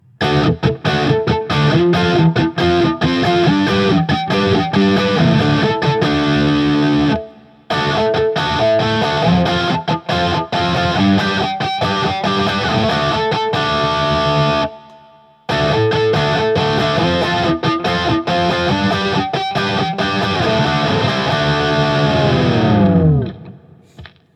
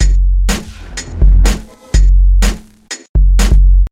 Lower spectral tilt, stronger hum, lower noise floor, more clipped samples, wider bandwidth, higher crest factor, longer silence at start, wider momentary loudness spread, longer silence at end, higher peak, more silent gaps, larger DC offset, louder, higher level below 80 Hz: first, -6.5 dB/octave vs -5 dB/octave; neither; first, -46 dBFS vs -31 dBFS; neither; about the same, 10.5 kHz vs 11.5 kHz; about the same, 14 dB vs 10 dB; first, 0.2 s vs 0 s; second, 4 LU vs 15 LU; first, 0.3 s vs 0.05 s; about the same, 0 dBFS vs 0 dBFS; second, none vs 3.09-3.14 s; neither; about the same, -15 LUFS vs -13 LUFS; second, -40 dBFS vs -10 dBFS